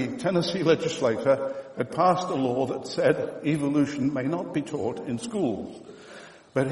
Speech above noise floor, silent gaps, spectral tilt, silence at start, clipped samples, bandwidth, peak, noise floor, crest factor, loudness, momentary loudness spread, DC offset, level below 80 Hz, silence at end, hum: 21 dB; none; -6 dB/octave; 0 s; under 0.1%; 11.5 kHz; -8 dBFS; -47 dBFS; 18 dB; -26 LUFS; 12 LU; under 0.1%; -64 dBFS; 0 s; none